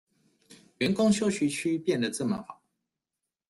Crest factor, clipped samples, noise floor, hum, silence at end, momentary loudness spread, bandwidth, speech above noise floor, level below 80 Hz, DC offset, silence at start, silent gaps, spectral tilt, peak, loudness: 18 dB; under 0.1%; -88 dBFS; none; 0.95 s; 8 LU; 12.5 kHz; 61 dB; -66 dBFS; under 0.1%; 0.5 s; none; -5 dB/octave; -12 dBFS; -28 LUFS